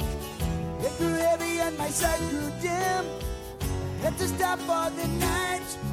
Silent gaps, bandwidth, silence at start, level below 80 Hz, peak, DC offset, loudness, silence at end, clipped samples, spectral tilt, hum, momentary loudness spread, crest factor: none; 16.5 kHz; 0 s; -40 dBFS; -14 dBFS; under 0.1%; -28 LUFS; 0 s; under 0.1%; -4.5 dB/octave; none; 7 LU; 14 dB